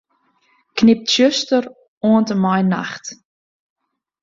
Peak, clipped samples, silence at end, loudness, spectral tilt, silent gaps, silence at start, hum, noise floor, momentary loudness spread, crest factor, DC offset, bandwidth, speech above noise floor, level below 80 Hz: -2 dBFS; under 0.1%; 1.1 s; -16 LUFS; -5 dB/octave; 1.88-2.01 s; 0.75 s; none; -61 dBFS; 15 LU; 16 dB; under 0.1%; 7.6 kHz; 46 dB; -58 dBFS